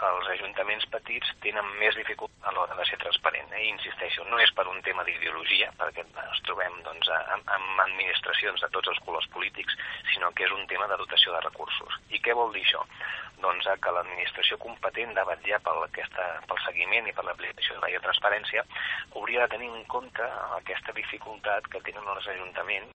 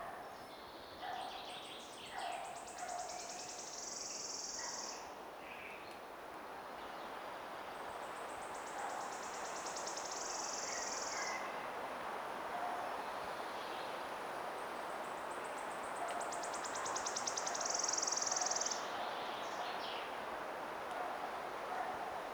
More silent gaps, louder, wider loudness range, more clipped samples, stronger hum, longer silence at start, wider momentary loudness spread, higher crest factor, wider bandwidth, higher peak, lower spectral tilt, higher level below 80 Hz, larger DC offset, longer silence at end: neither; first, -28 LUFS vs -42 LUFS; second, 3 LU vs 9 LU; neither; neither; about the same, 0 s vs 0 s; about the same, 10 LU vs 11 LU; about the same, 22 dB vs 20 dB; second, 8.4 kHz vs over 20 kHz; first, -6 dBFS vs -24 dBFS; first, -2.5 dB/octave vs -0.5 dB/octave; first, -64 dBFS vs -76 dBFS; neither; about the same, 0 s vs 0 s